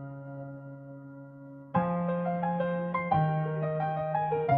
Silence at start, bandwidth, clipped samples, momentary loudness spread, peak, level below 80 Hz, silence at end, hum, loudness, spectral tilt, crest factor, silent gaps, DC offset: 0 s; 4.3 kHz; under 0.1%; 18 LU; -14 dBFS; -64 dBFS; 0 s; none; -30 LUFS; -11.5 dB/octave; 18 dB; none; under 0.1%